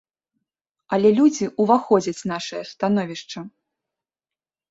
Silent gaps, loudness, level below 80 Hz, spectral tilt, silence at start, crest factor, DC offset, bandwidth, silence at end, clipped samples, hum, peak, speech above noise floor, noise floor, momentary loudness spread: none; -20 LUFS; -66 dBFS; -5.5 dB/octave; 0.9 s; 18 dB; under 0.1%; 8 kHz; 1.25 s; under 0.1%; none; -4 dBFS; over 70 dB; under -90 dBFS; 17 LU